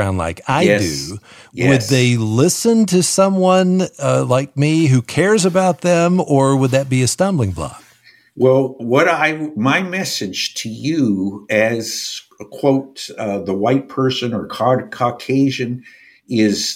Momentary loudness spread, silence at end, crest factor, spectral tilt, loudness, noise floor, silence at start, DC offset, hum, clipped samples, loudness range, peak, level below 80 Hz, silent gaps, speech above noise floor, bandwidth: 10 LU; 0 s; 14 dB; -5 dB/octave; -16 LUFS; -50 dBFS; 0 s; under 0.1%; none; under 0.1%; 5 LU; -2 dBFS; -50 dBFS; none; 34 dB; 16 kHz